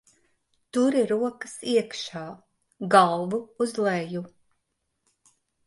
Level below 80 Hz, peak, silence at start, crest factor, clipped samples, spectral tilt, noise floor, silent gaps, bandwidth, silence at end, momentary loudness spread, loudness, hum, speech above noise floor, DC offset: -74 dBFS; -4 dBFS; 0.75 s; 22 dB; under 0.1%; -5 dB/octave; -77 dBFS; none; 11.5 kHz; 1.4 s; 17 LU; -25 LUFS; none; 53 dB; under 0.1%